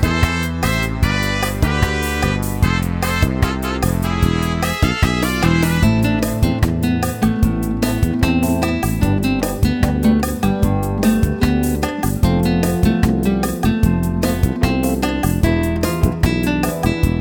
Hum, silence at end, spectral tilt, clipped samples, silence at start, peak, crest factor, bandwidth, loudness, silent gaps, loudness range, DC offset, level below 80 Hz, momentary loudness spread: none; 0 s; -6 dB/octave; under 0.1%; 0 s; 0 dBFS; 16 dB; 19.5 kHz; -17 LUFS; none; 1 LU; under 0.1%; -24 dBFS; 3 LU